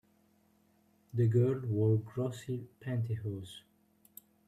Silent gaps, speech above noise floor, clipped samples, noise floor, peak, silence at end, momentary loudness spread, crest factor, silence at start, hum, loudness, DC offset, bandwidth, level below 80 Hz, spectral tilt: none; 37 dB; under 0.1%; -69 dBFS; -18 dBFS; 0.9 s; 13 LU; 16 dB; 1.15 s; none; -34 LUFS; under 0.1%; 14 kHz; -70 dBFS; -8.5 dB/octave